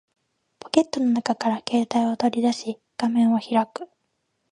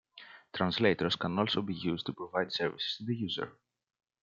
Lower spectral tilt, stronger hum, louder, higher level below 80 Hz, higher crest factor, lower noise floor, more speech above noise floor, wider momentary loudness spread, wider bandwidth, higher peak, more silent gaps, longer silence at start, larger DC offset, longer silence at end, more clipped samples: about the same, -5 dB/octave vs -6 dB/octave; neither; first, -23 LUFS vs -33 LUFS; about the same, -72 dBFS vs -70 dBFS; about the same, 22 dB vs 22 dB; first, -74 dBFS vs -55 dBFS; first, 52 dB vs 22 dB; second, 10 LU vs 13 LU; first, 10.5 kHz vs 7.6 kHz; first, -2 dBFS vs -12 dBFS; neither; first, 0.75 s vs 0.15 s; neither; about the same, 0.65 s vs 0.7 s; neither